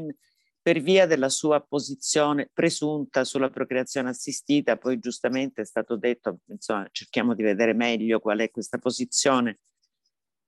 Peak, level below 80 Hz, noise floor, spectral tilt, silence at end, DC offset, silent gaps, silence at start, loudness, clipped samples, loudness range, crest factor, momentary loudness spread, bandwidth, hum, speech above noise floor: -6 dBFS; -74 dBFS; -80 dBFS; -3.5 dB/octave; 0.95 s; under 0.1%; none; 0 s; -25 LUFS; under 0.1%; 4 LU; 18 dB; 9 LU; 12.5 kHz; none; 55 dB